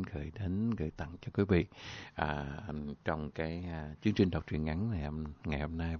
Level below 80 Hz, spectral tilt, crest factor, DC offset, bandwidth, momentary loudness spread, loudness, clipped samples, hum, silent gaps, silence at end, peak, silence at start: -46 dBFS; -6.5 dB/octave; 22 dB; under 0.1%; 6.6 kHz; 11 LU; -36 LUFS; under 0.1%; none; none; 0 s; -14 dBFS; 0 s